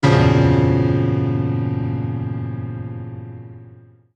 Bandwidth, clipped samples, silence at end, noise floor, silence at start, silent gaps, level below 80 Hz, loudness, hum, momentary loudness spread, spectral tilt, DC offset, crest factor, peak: 8.4 kHz; under 0.1%; 0.45 s; -45 dBFS; 0 s; none; -38 dBFS; -19 LUFS; none; 19 LU; -8 dB/octave; under 0.1%; 16 dB; -2 dBFS